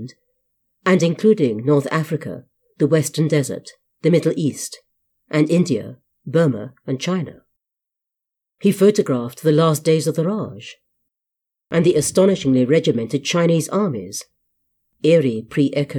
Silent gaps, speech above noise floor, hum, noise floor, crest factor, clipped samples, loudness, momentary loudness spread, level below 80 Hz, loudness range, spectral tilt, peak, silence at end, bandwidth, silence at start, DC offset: none; 67 dB; none; -84 dBFS; 16 dB; under 0.1%; -18 LUFS; 15 LU; -62 dBFS; 4 LU; -6 dB/octave; -4 dBFS; 0 s; 18 kHz; 0 s; under 0.1%